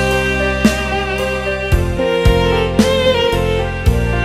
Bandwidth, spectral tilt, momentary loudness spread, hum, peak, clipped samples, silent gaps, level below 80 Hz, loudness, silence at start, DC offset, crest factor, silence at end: 16 kHz; -5.5 dB/octave; 5 LU; none; 0 dBFS; under 0.1%; none; -22 dBFS; -15 LUFS; 0 s; 0.2%; 14 dB; 0 s